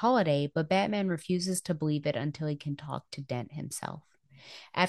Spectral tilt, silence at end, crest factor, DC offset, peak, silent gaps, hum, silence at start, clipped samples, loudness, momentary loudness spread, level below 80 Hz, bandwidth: -5.5 dB/octave; 0 s; 22 dB; under 0.1%; -10 dBFS; none; none; 0 s; under 0.1%; -32 LUFS; 12 LU; -70 dBFS; 12.5 kHz